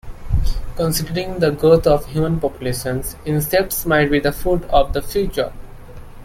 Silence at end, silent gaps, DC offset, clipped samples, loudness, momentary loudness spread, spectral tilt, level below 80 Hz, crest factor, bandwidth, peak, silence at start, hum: 0 s; none; under 0.1%; under 0.1%; -19 LUFS; 10 LU; -5.5 dB/octave; -28 dBFS; 16 dB; 16.5 kHz; -2 dBFS; 0.05 s; none